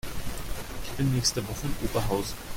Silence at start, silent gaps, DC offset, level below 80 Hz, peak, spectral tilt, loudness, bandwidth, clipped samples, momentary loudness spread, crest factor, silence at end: 0.05 s; none; under 0.1%; -38 dBFS; -10 dBFS; -4.5 dB/octave; -30 LUFS; 17 kHz; under 0.1%; 12 LU; 18 dB; 0 s